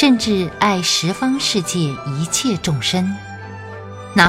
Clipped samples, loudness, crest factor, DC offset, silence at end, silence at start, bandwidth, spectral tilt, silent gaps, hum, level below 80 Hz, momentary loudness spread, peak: under 0.1%; -18 LUFS; 18 dB; under 0.1%; 0 s; 0 s; 16.5 kHz; -4 dB/octave; none; none; -48 dBFS; 16 LU; 0 dBFS